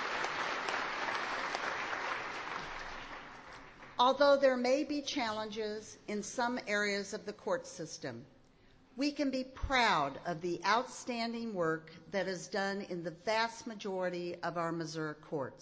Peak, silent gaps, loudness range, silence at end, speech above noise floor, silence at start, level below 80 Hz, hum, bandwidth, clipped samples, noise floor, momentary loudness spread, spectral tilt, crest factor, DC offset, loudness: -16 dBFS; none; 5 LU; 0 s; 28 dB; 0 s; -60 dBFS; none; 8 kHz; under 0.1%; -63 dBFS; 14 LU; -4 dB/octave; 20 dB; under 0.1%; -35 LUFS